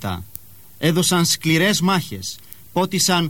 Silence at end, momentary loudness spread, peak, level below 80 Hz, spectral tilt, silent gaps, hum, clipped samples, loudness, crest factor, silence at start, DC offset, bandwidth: 0 s; 16 LU; -2 dBFS; -54 dBFS; -3.5 dB/octave; none; none; under 0.1%; -18 LUFS; 18 dB; 0 s; 0.6%; 17.5 kHz